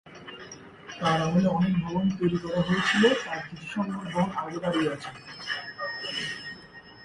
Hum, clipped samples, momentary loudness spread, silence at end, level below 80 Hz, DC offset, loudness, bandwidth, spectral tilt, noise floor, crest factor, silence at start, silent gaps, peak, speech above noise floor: none; under 0.1%; 19 LU; 0 s; -58 dBFS; under 0.1%; -27 LUFS; 11 kHz; -5.5 dB/octave; -48 dBFS; 20 dB; 0.05 s; none; -8 dBFS; 22 dB